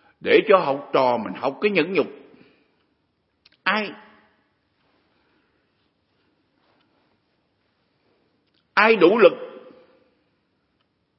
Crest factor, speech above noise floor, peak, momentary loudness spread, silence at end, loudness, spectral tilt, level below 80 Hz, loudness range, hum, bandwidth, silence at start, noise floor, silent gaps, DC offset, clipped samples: 24 dB; 52 dB; 0 dBFS; 14 LU; 1.6 s; -19 LUFS; -9 dB/octave; -76 dBFS; 10 LU; none; 5.8 kHz; 0.25 s; -70 dBFS; none; under 0.1%; under 0.1%